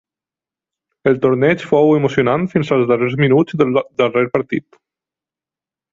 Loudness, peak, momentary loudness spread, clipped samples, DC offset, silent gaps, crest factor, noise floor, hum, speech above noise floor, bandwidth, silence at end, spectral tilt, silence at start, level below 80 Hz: -15 LUFS; -2 dBFS; 5 LU; under 0.1%; under 0.1%; none; 14 dB; -89 dBFS; none; 75 dB; 7.6 kHz; 1.35 s; -8 dB/octave; 1.05 s; -54 dBFS